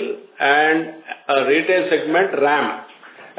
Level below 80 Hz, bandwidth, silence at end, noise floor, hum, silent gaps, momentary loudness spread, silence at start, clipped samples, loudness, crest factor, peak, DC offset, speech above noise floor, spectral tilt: -84 dBFS; 4 kHz; 0.1 s; -42 dBFS; none; none; 14 LU; 0 s; under 0.1%; -17 LUFS; 16 dB; -2 dBFS; under 0.1%; 25 dB; -8 dB/octave